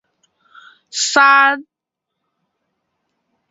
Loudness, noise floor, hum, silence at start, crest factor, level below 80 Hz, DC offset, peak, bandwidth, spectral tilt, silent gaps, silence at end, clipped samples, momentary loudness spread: -12 LUFS; -79 dBFS; none; 0.95 s; 20 dB; -74 dBFS; under 0.1%; 0 dBFS; 8 kHz; 1 dB/octave; none; 1.9 s; under 0.1%; 16 LU